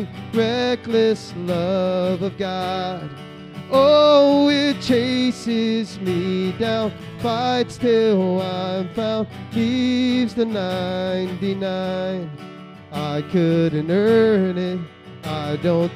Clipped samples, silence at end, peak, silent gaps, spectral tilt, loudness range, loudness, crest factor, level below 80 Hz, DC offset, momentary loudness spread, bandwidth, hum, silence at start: under 0.1%; 0 s; -4 dBFS; none; -6.5 dB/octave; 5 LU; -20 LUFS; 16 dB; -60 dBFS; under 0.1%; 13 LU; 15.5 kHz; none; 0 s